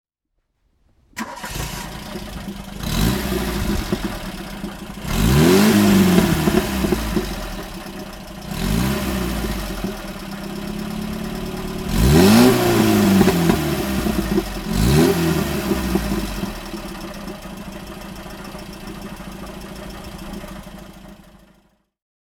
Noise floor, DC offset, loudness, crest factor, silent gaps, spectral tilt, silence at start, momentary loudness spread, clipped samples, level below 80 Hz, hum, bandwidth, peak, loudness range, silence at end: -73 dBFS; under 0.1%; -19 LUFS; 20 dB; none; -5.5 dB/octave; 1.15 s; 20 LU; under 0.1%; -30 dBFS; none; over 20 kHz; 0 dBFS; 17 LU; 1.2 s